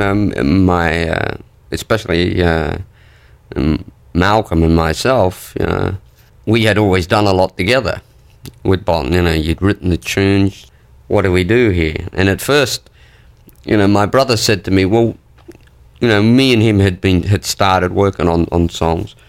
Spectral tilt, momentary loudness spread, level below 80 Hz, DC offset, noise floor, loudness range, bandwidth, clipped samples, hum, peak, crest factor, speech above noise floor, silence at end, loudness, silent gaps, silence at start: -6 dB/octave; 10 LU; -32 dBFS; under 0.1%; -44 dBFS; 3 LU; 16.5 kHz; under 0.1%; none; -2 dBFS; 14 dB; 31 dB; 0.2 s; -14 LUFS; none; 0 s